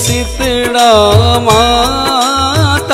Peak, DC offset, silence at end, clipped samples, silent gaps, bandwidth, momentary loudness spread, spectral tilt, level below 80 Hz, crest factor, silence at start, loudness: 0 dBFS; under 0.1%; 0 s; under 0.1%; none; 16.5 kHz; 6 LU; -4 dB/octave; -24 dBFS; 10 dB; 0 s; -9 LUFS